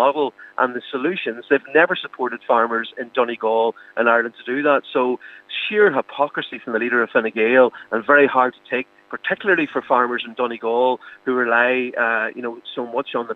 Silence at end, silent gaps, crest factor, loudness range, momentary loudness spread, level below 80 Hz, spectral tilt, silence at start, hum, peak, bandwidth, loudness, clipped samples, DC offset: 0 s; none; 18 dB; 3 LU; 10 LU; -80 dBFS; -6.5 dB/octave; 0 s; none; -2 dBFS; 4.6 kHz; -20 LUFS; under 0.1%; under 0.1%